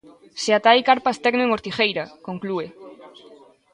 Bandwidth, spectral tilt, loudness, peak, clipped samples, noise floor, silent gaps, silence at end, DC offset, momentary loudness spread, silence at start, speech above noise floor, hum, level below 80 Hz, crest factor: 11 kHz; -3.5 dB/octave; -20 LUFS; -2 dBFS; under 0.1%; -49 dBFS; none; 0.65 s; under 0.1%; 16 LU; 0.35 s; 28 dB; none; -64 dBFS; 20 dB